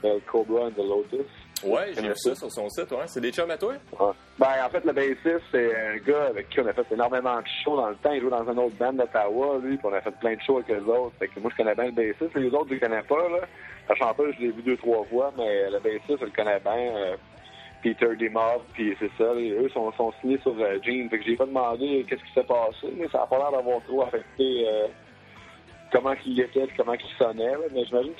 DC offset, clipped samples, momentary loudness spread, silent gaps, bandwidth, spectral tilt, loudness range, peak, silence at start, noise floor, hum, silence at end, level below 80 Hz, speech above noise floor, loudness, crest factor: under 0.1%; under 0.1%; 5 LU; none; 13.5 kHz; -5 dB/octave; 2 LU; -6 dBFS; 0.05 s; -49 dBFS; none; 0 s; -62 dBFS; 23 dB; -26 LUFS; 20 dB